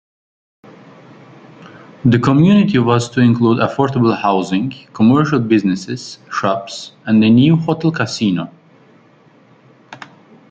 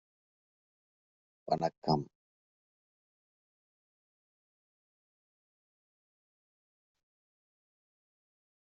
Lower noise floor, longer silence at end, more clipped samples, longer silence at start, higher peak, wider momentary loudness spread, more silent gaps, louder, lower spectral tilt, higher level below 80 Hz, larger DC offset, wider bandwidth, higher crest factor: second, -48 dBFS vs under -90 dBFS; second, 0.55 s vs 6.75 s; neither; first, 1.6 s vs 1.45 s; first, -2 dBFS vs -16 dBFS; about the same, 16 LU vs 18 LU; second, none vs 1.78-1.82 s; first, -14 LUFS vs -34 LUFS; about the same, -7 dB/octave vs -6 dB/octave; first, -52 dBFS vs -76 dBFS; neither; first, 8.8 kHz vs 7.2 kHz; second, 14 dB vs 28 dB